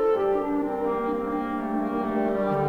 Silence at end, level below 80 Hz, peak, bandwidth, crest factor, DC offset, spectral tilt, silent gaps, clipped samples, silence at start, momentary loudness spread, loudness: 0 s; -50 dBFS; -14 dBFS; 15.5 kHz; 12 dB; under 0.1%; -8.5 dB/octave; none; under 0.1%; 0 s; 4 LU; -26 LUFS